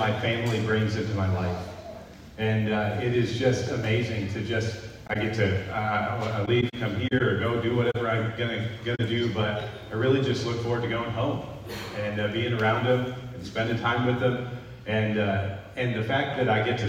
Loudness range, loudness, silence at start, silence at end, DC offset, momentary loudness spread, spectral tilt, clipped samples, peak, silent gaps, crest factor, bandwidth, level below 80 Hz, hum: 2 LU; -27 LUFS; 0 s; 0 s; under 0.1%; 9 LU; -6.5 dB/octave; under 0.1%; -10 dBFS; none; 16 dB; 15 kHz; -54 dBFS; none